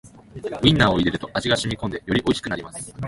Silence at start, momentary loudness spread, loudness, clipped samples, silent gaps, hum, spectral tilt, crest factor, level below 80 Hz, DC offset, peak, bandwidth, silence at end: 0.05 s; 14 LU; -21 LUFS; under 0.1%; none; none; -5 dB/octave; 22 dB; -42 dBFS; under 0.1%; -2 dBFS; 11.5 kHz; 0 s